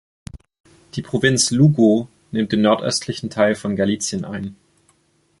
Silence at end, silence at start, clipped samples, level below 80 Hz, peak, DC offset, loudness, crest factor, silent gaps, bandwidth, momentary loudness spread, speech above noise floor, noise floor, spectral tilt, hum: 0.85 s; 0.35 s; under 0.1%; -50 dBFS; -2 dBFS; under 0.1%; -18 LUFS; 18 dB; 0.60-0.64 s; 11.5 kHz; 15 LU; 44 dB; -62 dBFS; -5 dB/octave; none